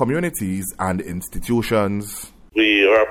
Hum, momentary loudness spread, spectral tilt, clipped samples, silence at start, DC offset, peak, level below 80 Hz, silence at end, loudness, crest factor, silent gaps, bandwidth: none; 15 LU; -4.5 dB/octave; under 0.1%; 0 s; under 0.1%; -4 dBFS; -42 dBFS; 0 s; -20 LUFS; 16 dB; none; 17 kHz